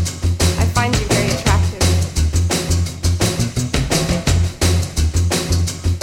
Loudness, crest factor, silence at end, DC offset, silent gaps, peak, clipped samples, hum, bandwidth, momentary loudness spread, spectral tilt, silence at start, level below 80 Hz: -17 LUFS; 16 dB; 0 s; under 0.1%; none; -2 dBFS; under 0.1%; none; 16.5 kHz; 3 LU; -4.5 dB/octave; 0 s; -24 dBFS